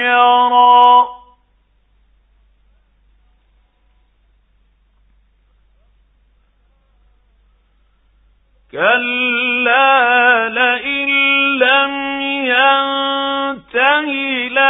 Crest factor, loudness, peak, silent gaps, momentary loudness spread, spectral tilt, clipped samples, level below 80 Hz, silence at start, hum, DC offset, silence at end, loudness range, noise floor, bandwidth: 16 dB; -12 LUFS; 0 dBFS; none; 8 LU; -5.5 dB/octave; under 0.1%; -56 dBFS; 0 s; none; under 0.1%; 0 s; 8 LU; -57 dBFS; 4 kHz